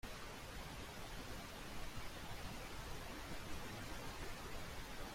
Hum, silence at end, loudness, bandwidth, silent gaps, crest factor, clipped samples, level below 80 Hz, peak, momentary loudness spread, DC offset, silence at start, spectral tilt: none; 0 s; -50 LUFS; 16.5 kHz; none; 14 dB; under 0.1%; -54 dBFS; -34 dBFS; 2 LU; under 0.1%; 0.05 s; -3.5 dB/octave